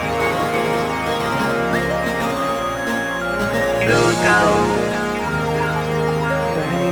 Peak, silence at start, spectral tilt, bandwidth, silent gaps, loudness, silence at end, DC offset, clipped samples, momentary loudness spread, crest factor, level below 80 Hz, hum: -2 dBFS; 0 s; -5 dB/octave; 19.5 kHz; none; -19 LUFS; 0 s; under 0.1%; under 0.1%; 7 LU; 16 dB; -40 dBFS; none